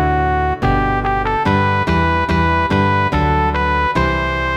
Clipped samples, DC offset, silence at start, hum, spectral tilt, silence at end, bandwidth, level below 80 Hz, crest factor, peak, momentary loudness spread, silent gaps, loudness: under 0.1%; under 0.1%; 0 s; none; -7 dB/octave; 0 s; 9.4 kHz; -24 dBFS; 12 dB; -2 dBFS; 2 LU; none; -16 LUFS